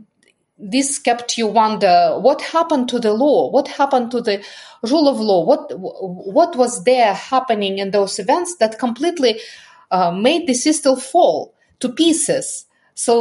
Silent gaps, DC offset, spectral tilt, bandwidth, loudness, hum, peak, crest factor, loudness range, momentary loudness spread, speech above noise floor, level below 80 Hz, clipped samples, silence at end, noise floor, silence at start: none; under 0.1%; -3.5 dB/octave; 11.5 kHz; -17 LUFS; none; -2 dBFS; 16 dB; 2 LU; 11 LU; 44 dB; -72 dBFS; under 0.1%; 0 s; -60 dBFS; 0.6 s